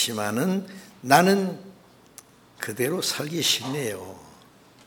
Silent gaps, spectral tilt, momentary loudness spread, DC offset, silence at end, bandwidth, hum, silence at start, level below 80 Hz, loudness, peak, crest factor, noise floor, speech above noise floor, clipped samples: none; -3.5 dB/octave; 20 LU; under 0.1%; 0.55 s; 19.5 kHz; none; 0 s; -70 dBFS; -24 LUFS; -2 dBFS; 24 dB; -53 dBFS; 29 dB; under 0.1%